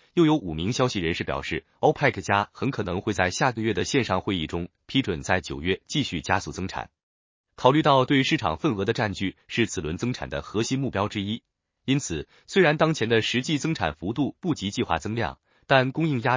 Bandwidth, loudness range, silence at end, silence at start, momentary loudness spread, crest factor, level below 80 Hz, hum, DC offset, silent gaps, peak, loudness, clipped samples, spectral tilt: 7.6 kHz; 4 LU; 0 s; 0.15 s; 10 LU; 22 dB; -48 dBFS; none; under 0.1%; 7.03-7.44 s; -2 dBFS; -25 LUFS; under 0.1%; -5 dB/octave